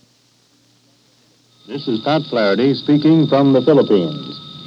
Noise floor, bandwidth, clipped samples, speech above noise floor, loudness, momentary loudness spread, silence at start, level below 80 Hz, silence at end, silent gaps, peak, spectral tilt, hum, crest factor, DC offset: -56 dBFS; 7 kHz; under 0.1%; 42 dB; -15 LUFS; 14 LU; 1.7 s; -70 dBFS; 0 s; none; -2 dBFS; -8 dB/octave; none; 16 dB; under 0.1%